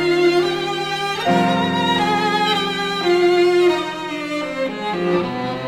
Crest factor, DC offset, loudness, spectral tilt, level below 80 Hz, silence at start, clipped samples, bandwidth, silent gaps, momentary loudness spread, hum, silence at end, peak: 14 dB; under 0.1%; -18 LUFS; -5 dB/octave; -54 dBFS; 0 s; under 0.1%; 14 kHz; none; 9 LU; none; 0 s; -4 dBFS